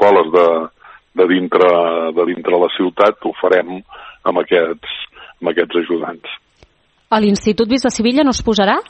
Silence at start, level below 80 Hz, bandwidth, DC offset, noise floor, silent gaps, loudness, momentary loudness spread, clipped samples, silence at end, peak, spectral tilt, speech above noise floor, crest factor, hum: 0 s; -44 dBFS; 8.6 kHz; under 0.1%; -52 dBFS; none; -15 LUFS; 14 LU; under 0.1%; 0.05 s; 0 dBFS; -4.5 dB/octave; 38 dB; 16 dB; none